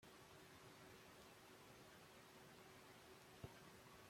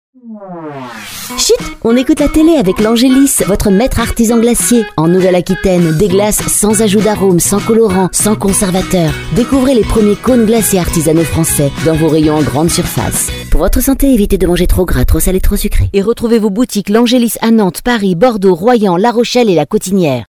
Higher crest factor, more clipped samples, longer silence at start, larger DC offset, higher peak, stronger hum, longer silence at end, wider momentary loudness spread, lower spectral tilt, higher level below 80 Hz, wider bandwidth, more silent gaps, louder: first, 24 dB vs 10 dB; second, under 0.1% vs 0.1%; second, 0 s vs 0.25 s; neither; second, -40 dBFS vs 0 dBFS; neither; about the same, 0 s vs 0.05 s; about the same, 3 LU vs 5 LU; about the same, -4 dB/octave vs -5 dB/octave; second, -82 dBFS vs -20 dBFS; about the same, 16.5 kHz vs 18 kHz; neither; second, -63 LUFS vs -10 LUFS